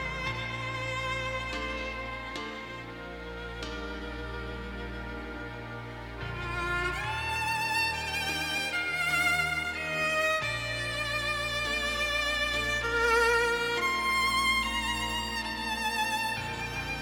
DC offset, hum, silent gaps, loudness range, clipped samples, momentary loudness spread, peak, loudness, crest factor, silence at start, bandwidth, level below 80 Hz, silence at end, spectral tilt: under 0.1%; none; none; 12 LU; under 0.1%; 13 LU; -14 dBFS; -29 LUFS; 18 dB; 0 s; over 20 kHz; -46 dBFS; 0 s; -3 dB/octave